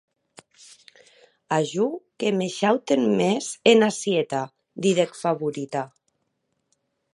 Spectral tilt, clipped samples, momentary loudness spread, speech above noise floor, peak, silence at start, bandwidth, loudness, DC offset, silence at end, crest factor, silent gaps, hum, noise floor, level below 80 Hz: -4.5 dB/octave; under 0.1%; 11 LU; 53 dB; -2 dBFS; 1.5 s; 11.5 kHz; -23 LUFS; under 0.1%; 1.3 s; 22 dB; none; none; -75 dBFS; -74 dBFS